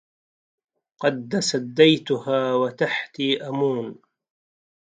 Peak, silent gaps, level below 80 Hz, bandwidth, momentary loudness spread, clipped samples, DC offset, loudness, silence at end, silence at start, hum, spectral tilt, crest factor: -2 dBFS; none; -72 dBFS; 9.4 kHz; 8 LU; under 0.1%; under 0.1%; -22 LUFS; 1 s; 1 s; none; -4.5 dB/octave; 22 dB